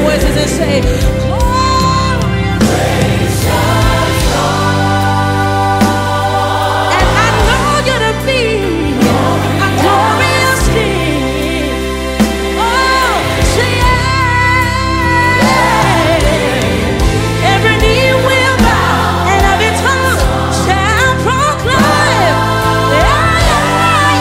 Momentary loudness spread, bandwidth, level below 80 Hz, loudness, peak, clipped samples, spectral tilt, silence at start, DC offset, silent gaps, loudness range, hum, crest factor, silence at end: 4 LU; 16.5 kHz; -20 dBFS; -11 LUFS; 0 dBFS; under 0.1%; -4.5 dB/octave; 0 s; under 0.1%; none; 2 LU; none; 10 dB; 0 s